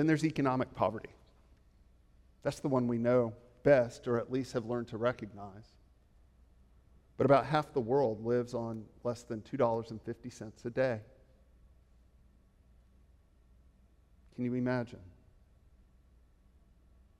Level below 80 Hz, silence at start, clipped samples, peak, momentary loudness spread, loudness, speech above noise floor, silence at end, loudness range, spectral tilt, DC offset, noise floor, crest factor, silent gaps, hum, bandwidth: -62 dBFS; 0 s; under 0.1%; -14 dBFS; 17 LU; -33 LUFS; 32 dB; 2.15 s; 9 LU; -7.5 dB/octave; under 0.1%; -64 dBFS; 22 dB; none; none; 12.5 kHz